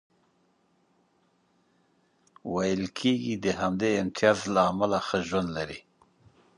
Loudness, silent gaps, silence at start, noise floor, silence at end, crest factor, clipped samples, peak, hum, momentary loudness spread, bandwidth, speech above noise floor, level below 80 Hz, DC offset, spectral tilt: -27 LUFS; none; 2.45 s; -69 dBFS; 0.8 s; 24 dB; under 0.1%; -6 dBFS; none; 10 LU; 11.5 kHz; 42 dB; -58 dBFS; under 0.1%; -5 dB/octave